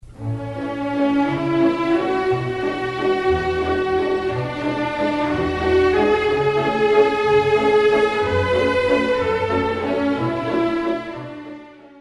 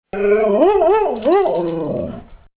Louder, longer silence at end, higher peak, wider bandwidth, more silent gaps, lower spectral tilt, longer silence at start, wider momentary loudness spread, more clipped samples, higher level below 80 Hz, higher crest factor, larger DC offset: second, -19 LUFS vs -16 LUFS; second, 0 s vs 0.2 s; about the same, -4 dBFS vs -2 dBFS; first, 11.5 kHz vs 4 kHz; neither; second, -6.5 dB/octave vs -10.5 dB/octave; about the same, 0.05 s vs 0.15 s; about the same, 10 LU vs 12 LU; neither; about the same, -42 dBFS vs -44 dBFS; about the same, 16 dB vs 14 dB; neither